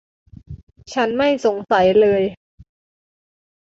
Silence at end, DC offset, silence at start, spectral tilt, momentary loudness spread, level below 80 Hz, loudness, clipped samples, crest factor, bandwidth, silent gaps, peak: 1.35 s; under 0.1%; 0.5 s; -5.5 dB/octave; 25 LU; -50 dBFS; -17 LUFS; under 0.1%; 16 dB; 7.8 kHz; 0.63-0.67 s; -4 dBFS